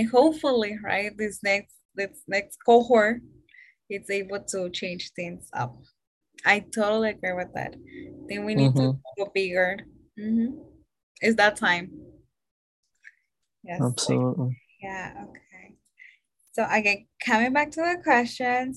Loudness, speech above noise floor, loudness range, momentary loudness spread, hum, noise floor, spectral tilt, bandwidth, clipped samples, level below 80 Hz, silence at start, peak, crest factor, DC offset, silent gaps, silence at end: -25 LUFS; 50 dB; 6 LU; 16 LU; none; -75 dBFS; -5 dB/octave; 12.5 kHz; under 0.1%; -62 dBFS; 0 s; -6 dBFS; 20 dB; under 0.1%; 1.85-1.89 s, 6.07-6.21 s, 11.03-11.15 s, 12.51-12.83 s; 0 s